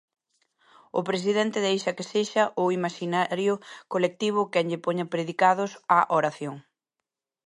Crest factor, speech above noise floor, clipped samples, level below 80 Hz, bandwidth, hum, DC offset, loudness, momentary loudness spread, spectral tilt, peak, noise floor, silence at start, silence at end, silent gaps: 20 dB; 61 dB; under 0.1%; -78 dBFS; 11.5 kHz; none; under 0.1%; -26 LUFS; 9 LU; -5 dB/octave; -6 dBFS; -86 dBFS; 0.95 s; 0.85 s; none